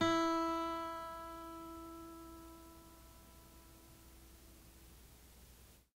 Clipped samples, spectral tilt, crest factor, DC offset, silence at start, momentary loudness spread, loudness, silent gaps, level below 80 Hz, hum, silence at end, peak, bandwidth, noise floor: under 0.1%; -4.5 dB/octave; 20 dB; under 0.1%; 0 s; 24 LU; -41 LUFS; none; -64 dBFS; none; 0.2 s; -24 dBFS; 16 kHz; -62 dBFS